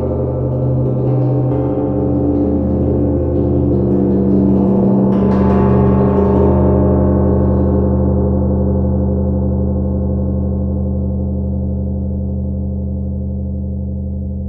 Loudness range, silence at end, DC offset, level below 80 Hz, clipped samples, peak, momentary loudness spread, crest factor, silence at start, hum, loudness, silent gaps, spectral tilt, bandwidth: 7 LU; 0 s; under 0.1%; -22 dBFS; under 0.1%; -2 dBFS; 9 LU; 12 dB; 0 s; none; -15 LUFS; none; -13 dB/octave; 3.1 kHz